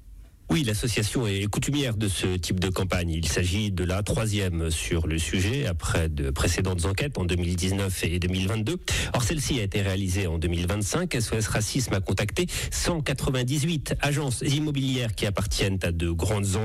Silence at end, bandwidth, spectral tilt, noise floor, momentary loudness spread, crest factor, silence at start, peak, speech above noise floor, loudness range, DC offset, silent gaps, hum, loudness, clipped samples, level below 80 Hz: 0 s; 16 kHz; -4.5 dB/octave; -46 dBFS; 2 LU; 12 dB; 0 s; -14 dBFS; 20 dB; 0 LU; under 0.1%; none; none; -26 LUFS; under 0.1%; -36 dBFS